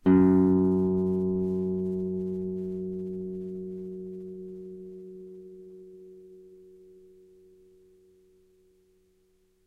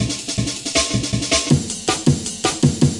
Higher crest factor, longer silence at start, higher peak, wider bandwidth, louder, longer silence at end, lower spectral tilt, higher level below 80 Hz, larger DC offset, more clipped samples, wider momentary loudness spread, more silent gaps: about the same, 20 dB vs 18 dB; about the same, 0.05 s vs 0 s; second, -10 dBFS vs -2 dBFS; second, 3.3 kHz vs 11.5 kHz; second, -28 LUFS vs -19 LUFS; first, 3.1 s vs 0 s; first, -11.5 dB/octave vs -4 dB/octave; second, -62 dBFS vs -40 dBFS; neither; neither; first, 26 LU vs 5 LU; neither